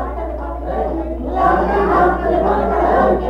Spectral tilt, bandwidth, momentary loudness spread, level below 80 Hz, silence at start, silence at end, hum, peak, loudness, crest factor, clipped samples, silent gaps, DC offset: -8.5 dB/octave; 6.8 kHz; 10 LU; -26 dBFS; 0 s; 0 s; none; -2 dBFS; -17 LUFS; 14 dB; under 0.1%; none; under 0.1%